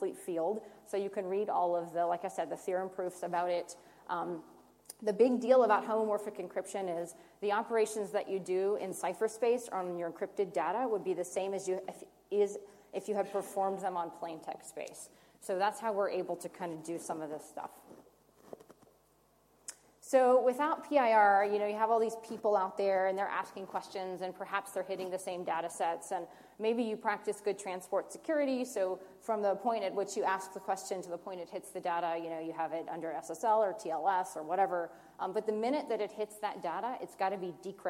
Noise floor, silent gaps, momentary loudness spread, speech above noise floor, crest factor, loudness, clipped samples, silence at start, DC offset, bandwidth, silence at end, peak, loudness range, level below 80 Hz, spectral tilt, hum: -69 dBFS; none; 13 LU; 35 dB; 20 dB; -34 LUFS; under 0.1%; 0 s; under 0.1%; 16.5 kHz; 0 s; -14 dBFS; 8 LU; -80 dBFS; -4.5 dB/octave; none